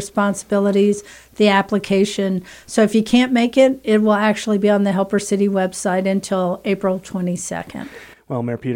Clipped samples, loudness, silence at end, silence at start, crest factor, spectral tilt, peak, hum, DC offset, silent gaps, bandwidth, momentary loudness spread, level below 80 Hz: under 0.1%; -18 LUFS; 0 s; 0 s; 16 dB; -5.5 dB/octave; -2 dBFS; none; under 0.1%; none; 16 kHz; 11 LU; -54 dBFS